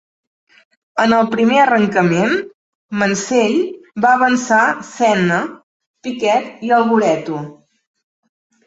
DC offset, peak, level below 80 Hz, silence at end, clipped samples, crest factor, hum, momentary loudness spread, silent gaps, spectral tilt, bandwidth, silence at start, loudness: under 0.1%; -2 dBFS; -58 dBFS; 1.15 s; under 0.1%; 16 dB; none; 13 LU; 2.54-2.89 s, 5.63-5.80 s, 5.86-5.94 s; -5 dB/octave; 8 kHz; 0.95 s; -15 LUFS